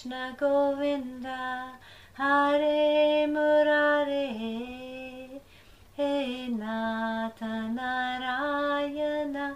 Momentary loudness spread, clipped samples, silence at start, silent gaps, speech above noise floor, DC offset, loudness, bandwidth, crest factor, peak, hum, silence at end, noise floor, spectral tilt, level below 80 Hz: 17 LU; under 0.1%; 0 s; none; 27 dB; under 0.1%; -28 LUFS; 11.5 kHz; 14 dB; -14 dBFS; none; 0 s; -55 dBFS; -5 dB/octave; -62 dBFS